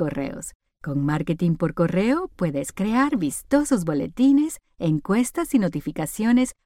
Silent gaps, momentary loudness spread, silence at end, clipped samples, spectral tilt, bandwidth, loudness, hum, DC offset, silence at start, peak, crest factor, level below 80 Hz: 0.55-0.60 s; 8 LU; 0.15 s; under 0.1%; -6.5 dB/octave; 16.5 kHz; -23 LUFS; none; under 0.1%; 0 s; -6 dBFS; 18 dB; -48 dBFS